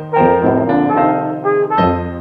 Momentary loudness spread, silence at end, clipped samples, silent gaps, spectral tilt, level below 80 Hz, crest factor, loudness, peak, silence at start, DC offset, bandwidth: 4 LU; 0 s; under 0.1%; none; -10 dB/octave; -46 dBFS; 14 dB; -14 LUFS; 0 dBFS; 0 s; under 0.1%; 5.4 kHz